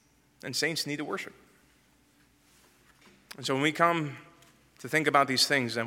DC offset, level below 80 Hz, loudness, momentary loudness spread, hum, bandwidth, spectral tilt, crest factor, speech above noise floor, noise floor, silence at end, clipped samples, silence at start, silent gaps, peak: under 0.1%; -74 dBFS; -28 LUFS; 20 LU; none; 17 kHz; -3.5 dB/octave; 24 dB; 36 dB; -64 dBFS; 0 s; under 0.1%; 0.45 s; none; -8 dBFS